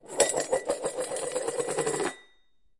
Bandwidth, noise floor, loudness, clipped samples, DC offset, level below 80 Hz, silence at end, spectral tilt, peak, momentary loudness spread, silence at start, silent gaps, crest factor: 11.5 kHz; -68 dBFS; -29 LUFS; under 0.1%; under 0.1%; -66 dBFS; 0.6 s; -2 dB/octave; -6 dBFS; 7 LU; 0.05 s; none; 24 dB